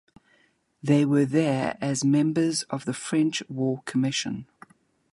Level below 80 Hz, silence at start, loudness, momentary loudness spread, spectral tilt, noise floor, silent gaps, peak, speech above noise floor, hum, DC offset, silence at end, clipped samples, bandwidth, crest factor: -68 dBFS; 0.85 s; -25 LUFS; 9 LU; -5.5 dB/octave; -65 dBFS; none; -8 dBFS; 41 dB; none; under 0.1%; 0.7 s; under 0.1%; 11.5 kHz; 18 dB